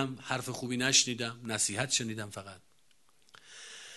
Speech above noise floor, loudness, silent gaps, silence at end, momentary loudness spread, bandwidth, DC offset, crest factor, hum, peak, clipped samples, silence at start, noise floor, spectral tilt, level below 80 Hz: 37 dB; -30 LUFS; none; 0 s; 22 LU; 12.5 kHz; under 0.1%; 24 dB; none; -12 dBFS; under 0.1%; 0 s; -70 dBFS; -2 dB/octave; -70 dBFS